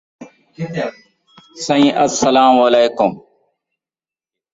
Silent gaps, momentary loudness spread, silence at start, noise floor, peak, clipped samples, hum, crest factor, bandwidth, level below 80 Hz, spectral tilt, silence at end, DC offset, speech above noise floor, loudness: none; 15 LU; 0.2 s; under -90 dBFS; -2 dBFS; under 0.1%; none; 16 dB; 8 kHz; -58 dBFS; -4 dB/octave; 1.35 s; under 0.1%; over 77 dB; -14 LUFS